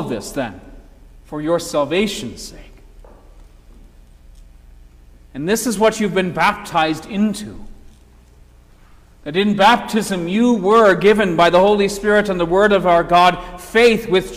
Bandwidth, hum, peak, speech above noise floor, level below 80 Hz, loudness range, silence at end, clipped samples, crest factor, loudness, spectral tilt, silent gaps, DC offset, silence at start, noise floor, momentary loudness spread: 16 kHz; 60 Hz at -50 dBFS; -2 dBFS; 30 dB; -42 dBFS; 10 LU; 0 s; under 0.1%; 14 dB; -16 LUFS; -4.5 dB/octave; none; under 0.1%; 0 s; -46 dBFS; 16 LU